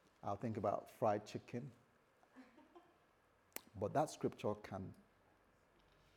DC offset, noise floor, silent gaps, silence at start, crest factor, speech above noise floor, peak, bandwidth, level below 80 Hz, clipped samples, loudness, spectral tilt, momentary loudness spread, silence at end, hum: under 0.1%; -74 dBFS; none; 0.25 s; 22 dB; 32 dB; -24 dBFS; 19 kHz; -82 dBFS; under 0.1%; -44 LUFS; -6.5 dB/octave; 16 LU; 1.15 s; none